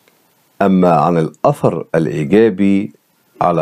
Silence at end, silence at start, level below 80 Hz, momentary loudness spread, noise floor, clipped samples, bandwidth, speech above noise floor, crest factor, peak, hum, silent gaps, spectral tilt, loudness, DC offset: 0 s; 0.6 s; -52 dBFS; 7 LU; -55 dBFS; under 0.1%; 12.5 kHz; 43 dB; 14 dB; 0 dBFS; none; none; -8.5 dB/octave; -14 LUFS; under 0.1%